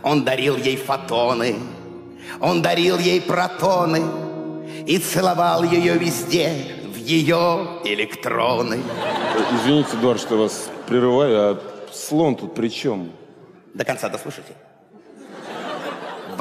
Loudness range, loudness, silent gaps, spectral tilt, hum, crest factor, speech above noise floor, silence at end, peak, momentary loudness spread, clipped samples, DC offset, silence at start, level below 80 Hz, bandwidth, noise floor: 6 LU; -20 LUFS; none; -5 dB/octave; none; 14 dB; 28 dB; 0 s; -6 dBFS; 14 LU; under 0.1%; under 0.1%; 0 s; -62 dBFS; 15.5 kHz; -47 dBFS